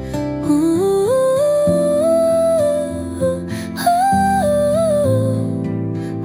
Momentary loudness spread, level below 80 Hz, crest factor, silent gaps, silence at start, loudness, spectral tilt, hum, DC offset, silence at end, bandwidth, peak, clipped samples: 8 LU; -44 dBFS; 12 dB; none; 0 s; -17 LUFS; -6.5 dB/octave; none; under 0.1%; 0 s; 16.5 kHz; -4 dBFS; under 0.1%